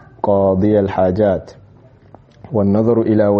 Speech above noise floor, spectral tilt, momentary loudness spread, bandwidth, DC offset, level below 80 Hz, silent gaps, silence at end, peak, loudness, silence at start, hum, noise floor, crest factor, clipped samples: 31 dB; -9 dB/octave; 5 LU; 6.2 kHz; under 0.1%; -46 dBFS; none; 0 s; -2 dBFS; -15 LUFS; 0.25 s; none; -45 dBFS; 14 dB; under 0.1%